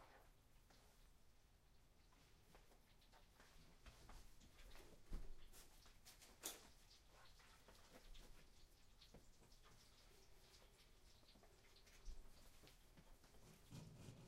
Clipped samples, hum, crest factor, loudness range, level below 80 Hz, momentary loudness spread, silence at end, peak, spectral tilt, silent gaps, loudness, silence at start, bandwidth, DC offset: under 0.1%; none; 32 dB; 7 LU; -66 dBFS; 10 LU; 0 s; -32 dBFS; -3 dB/octave; none; -64 LUFS; 0 s; 15.5 kHz; under 0.1%